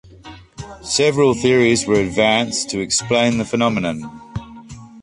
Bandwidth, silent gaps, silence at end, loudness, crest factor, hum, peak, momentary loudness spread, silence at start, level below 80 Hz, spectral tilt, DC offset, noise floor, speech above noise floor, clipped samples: 11.5 kHz; none; 0 s; -17 LUFS; 16 dB; none; -2 dBFS; 18 LU; 0.25 s; -46 dBFS; -4 dB/octave; under 0.1%; -40 dBFS; 23 dB; under 0.1%